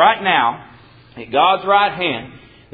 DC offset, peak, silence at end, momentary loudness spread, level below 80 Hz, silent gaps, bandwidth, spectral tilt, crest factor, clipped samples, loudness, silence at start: under 0.1%; 0 dBFS; 0.35 s; 15 LU; -54 dBFS; none; 4.9 kHz; -9 dB/octave; 18 dB; under 0.1%; -16 LUFS; 0 s